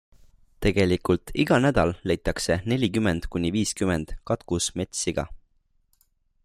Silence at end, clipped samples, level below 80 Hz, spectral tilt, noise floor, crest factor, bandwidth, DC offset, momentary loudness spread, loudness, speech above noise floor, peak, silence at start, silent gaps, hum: 1.1 s; under 0.1%; -42 dBFS; -5 dB/octave; -67 dBFS; 18 dB; 15.5 kHz; under 0.1%; 7 LU; -25 LUFS; 42 dB; -8 dBFS; 0.6 s; none; none